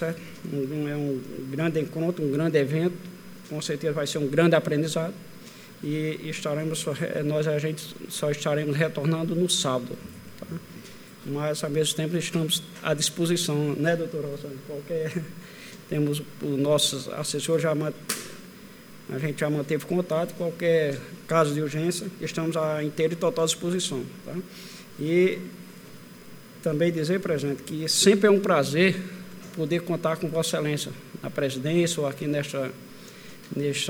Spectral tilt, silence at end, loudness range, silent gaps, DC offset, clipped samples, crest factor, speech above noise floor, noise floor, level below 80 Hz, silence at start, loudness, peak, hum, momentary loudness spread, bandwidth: -4.5 dB/octave; 0 s; 5 LU; none; under 0.1%; under 0.1%; 20 dB; 20 dB; -46 dBFS; -66 dBFS; 0 s; -26 LUFS; -6 dBFS; none; 19 LU; over 20 kHz